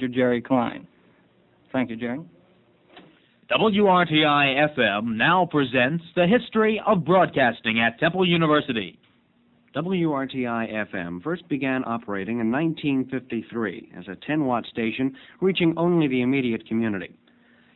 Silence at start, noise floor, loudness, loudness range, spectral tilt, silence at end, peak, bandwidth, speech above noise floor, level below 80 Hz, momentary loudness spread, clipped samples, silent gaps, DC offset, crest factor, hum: 0 s; -61 dBFS; -23 LUFS; 7 LU; -8.5 dB/octave; 0.7 s; -6 dBFS; 4.2 kHz; 39 dB; -60 dBFS; 12 LU; under 0.1%; none; under 0.1%; 18 dB; none